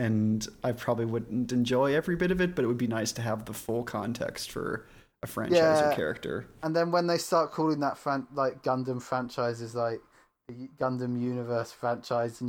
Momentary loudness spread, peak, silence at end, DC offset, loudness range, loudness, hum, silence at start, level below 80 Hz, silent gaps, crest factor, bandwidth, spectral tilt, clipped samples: 9 LU; -12 dBFS; 0 s; under 0.1%; 5 LU; -29 LUFS; none; 0 s; -58 dBFS; none; 18 dB; 19.5 kHz; -5.5 dB/octave; under 0.1%